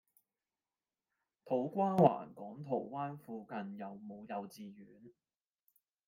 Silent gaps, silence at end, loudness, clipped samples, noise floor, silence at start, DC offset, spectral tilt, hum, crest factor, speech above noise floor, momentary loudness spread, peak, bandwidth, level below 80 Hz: none; 1 s; -36 LUFS; under 0.1%; under -90 dBFS; 1.45 s; under 0.1%; -8.5 dB/octave; none; 26 dB; over 53 dB; 20 LU; -14 dBFS; 16 kHz; -82 dBFS